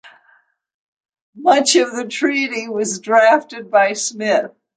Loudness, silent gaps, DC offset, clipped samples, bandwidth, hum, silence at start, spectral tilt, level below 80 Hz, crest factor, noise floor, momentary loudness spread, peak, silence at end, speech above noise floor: -16 LUFS; 0.74-0.97 s, 1.21-1.33 s; under 0.1%; under 0.1%; 9.6 kHz; none; 0.05 s; -2 dB/octave; -72 dBFS; 16 dB; -57 dBFS; 9 LU; 0 dBFS; 0.3 s; 41 dB